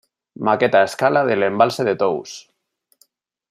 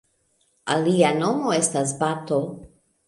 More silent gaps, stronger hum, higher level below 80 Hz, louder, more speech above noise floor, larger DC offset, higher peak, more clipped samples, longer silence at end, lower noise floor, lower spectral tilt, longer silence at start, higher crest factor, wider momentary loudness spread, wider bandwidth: neither; neither; about the same, -66 dBFS vs -62 dBFS; first, -18 LUFS vs -22 LUFS; first, 49 dB vs 45 dB; neither; about the same, -2 dBFS vs -4 dBFS; neither; first, 1.1 s vs 0.4 s; about the same, -66 dBFS vs -67 dBFS; about the same, -5 dB/octave vs -4.5 dB/octave; second, 0.4 s vs 0.65 s; about the same, 18 dB vs 20 dB; about the same, 11 LU vs 13 LU; first, 15 kHz vs 11.5 kHz